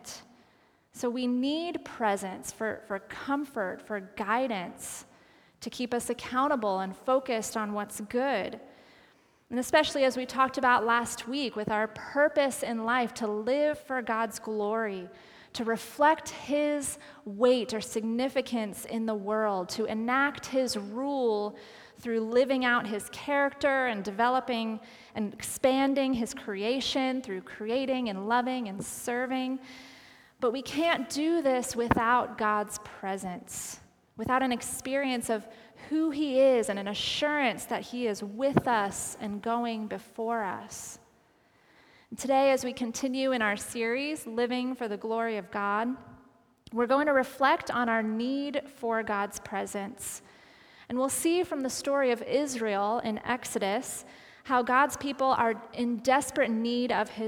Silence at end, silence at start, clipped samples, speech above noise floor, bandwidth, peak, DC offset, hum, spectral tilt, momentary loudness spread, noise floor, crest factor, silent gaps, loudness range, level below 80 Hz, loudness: 0 s; 0.05 s; under 0.1%; 35 dB; 19.5 kHz; -6 dBFS; under 0.1%; none; -3.5 dB/octave; 12 LU; -64 dBFS; 22 dB; none; 4 LU; -64 dBFS; -29 LUFS